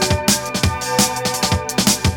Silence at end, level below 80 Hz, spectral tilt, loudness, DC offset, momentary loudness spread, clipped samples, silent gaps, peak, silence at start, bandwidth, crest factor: 0 s; -32 dBFS; -3 dB/octave; -17 LUFS; under 0.1%; 4 LU; under 0.1%; none; -2 dBFS; 0 s; 19 kHz; 16 dB